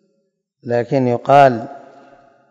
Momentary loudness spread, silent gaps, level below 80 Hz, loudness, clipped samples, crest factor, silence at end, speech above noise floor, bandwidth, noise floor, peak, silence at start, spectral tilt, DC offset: 21 LU; none; -64 dBFS; -15 LUFS; 0.3%; 18 dB; 0.75 s; 54 dB; 7.8 kHz; -68 dBFS; 0 dBFS; 0.65 s; -7.5 dB/octave; under 0.1%